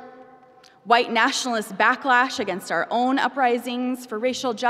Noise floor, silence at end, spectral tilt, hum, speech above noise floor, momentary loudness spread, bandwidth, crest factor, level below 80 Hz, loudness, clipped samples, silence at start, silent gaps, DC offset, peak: -52 dBFS; 0 s; -2.5 dB/octave; none; 30 dB; 8 LU; 15.5 kHz; 18 dB; -74 dBFS; -22 LUFS; under 0.1%; 0 s; none; under 0.1%; -4 dBFS